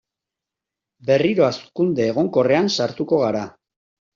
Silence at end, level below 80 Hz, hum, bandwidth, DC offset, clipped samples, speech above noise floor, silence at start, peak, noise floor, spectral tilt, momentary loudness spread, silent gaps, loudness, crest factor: 0.65 s; -60 dBFS; none; 7.4 kHz; under 0.1%; under 0.1%; 67 dB; 1.05 s; -4 dBFS; -86 dBFS; -5 dB/octave; 7 LU; none; -19 LUFS; 16 dB